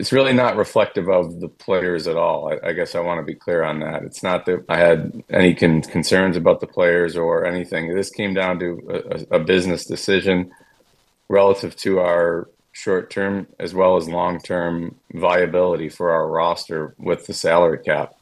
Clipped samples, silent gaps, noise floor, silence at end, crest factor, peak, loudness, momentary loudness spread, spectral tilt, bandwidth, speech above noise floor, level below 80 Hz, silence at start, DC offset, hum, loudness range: under 0.1%; none; -60 dBFS; 0.15 s; 20 dB; 0 dBFS; -19 LUFS; 10 LU; -5.5 dB/octave; 12.5 kHz; 41 dB; -54 dBFS; 0 s; under 0.1%; none; 4 LU